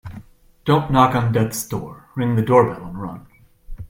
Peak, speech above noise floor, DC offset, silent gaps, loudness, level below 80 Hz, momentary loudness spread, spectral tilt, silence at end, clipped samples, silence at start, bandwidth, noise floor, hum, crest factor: 0 dBFS; 25 dB; under 0.1%; none; -19 LUFS; -42 dBFS; 16 LU; -6.5 dB/octave; 0.05 s; under 0.1%; 0.05 s; 16.5 kHz; -43 dBFS; none; 20 dB